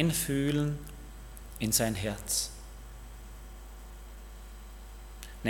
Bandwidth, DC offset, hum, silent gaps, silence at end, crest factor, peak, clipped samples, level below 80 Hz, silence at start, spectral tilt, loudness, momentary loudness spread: 18 kHz; under 0.1%; none; none; 0 s; 24 dB; -10 dBFS; under 0.1%; -46 dBFS; 0 s; -4 dB/octave; -30 LUFS; 21 LU